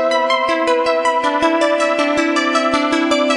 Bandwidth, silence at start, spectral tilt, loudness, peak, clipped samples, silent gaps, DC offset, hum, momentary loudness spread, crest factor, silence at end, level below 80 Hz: 11.5 kHz; 0 s; -2.5 dB/octave; -15 LUFS; -2 dBFS; under 0.1%; none; under 0.1%; none; 1 LU; 14 dB; 0 s; -54 dBFS